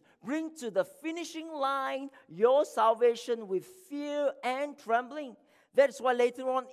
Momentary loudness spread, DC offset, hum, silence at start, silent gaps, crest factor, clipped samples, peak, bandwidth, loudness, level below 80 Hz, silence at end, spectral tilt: 14 LU; under 0.1%; none; 0.25 s; none; 20 dB; under 0.1%; -12 dBFS; 14.5 kHz; -31 LUFS; under -90 dBFS; 0 s; -4 dB/octave